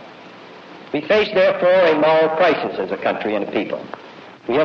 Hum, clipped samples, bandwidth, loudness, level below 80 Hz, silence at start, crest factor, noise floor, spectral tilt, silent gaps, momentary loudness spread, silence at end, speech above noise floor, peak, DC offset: none; under 0.1%; 6.6 kHz; -17 LUFS; -58 dBFS; 0 s; 14 dB; -40 dBFS; -6.5 dB/octave; none; 17 LU; 0 s; 23 dB; -6 dBFS; under 0.1%